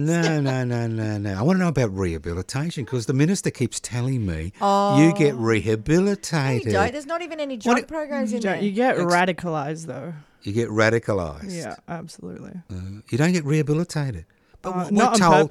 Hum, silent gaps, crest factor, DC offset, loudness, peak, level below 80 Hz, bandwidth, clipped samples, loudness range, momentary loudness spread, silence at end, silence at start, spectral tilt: none; none; 18 dB; under 0.1%; -22 LUFS; -4 dBFS; -48 dBFS; 14.5 kHz; under 0.1%; 5 LU; 16 LU; 0 s; 0 s; -6 dB/octave